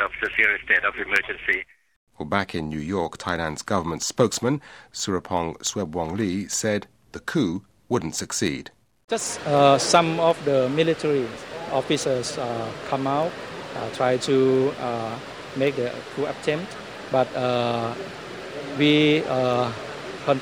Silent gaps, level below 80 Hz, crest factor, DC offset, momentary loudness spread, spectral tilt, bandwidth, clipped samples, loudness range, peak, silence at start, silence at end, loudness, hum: 1.96-2.07 s, 9.04-9.08 s; -54 dBFS; 22 dB; under 0.1%; 15 LU; -4 dB/octave; 19.5 kHz; under 0.1%; 5 LU; -2 dBFS; 0 s; 0 s; -24 LUFS; none